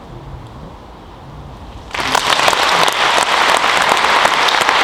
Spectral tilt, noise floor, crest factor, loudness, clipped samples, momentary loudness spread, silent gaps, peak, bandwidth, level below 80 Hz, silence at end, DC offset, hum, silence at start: -1 dB/octave; -35 dBFS; 16 dB; -12 LUFS; under 0.1%; 22 LU; none; 0 dBFS; 19 kHz; -40 dBFS; 0 s; under 0.1%; none; 0 s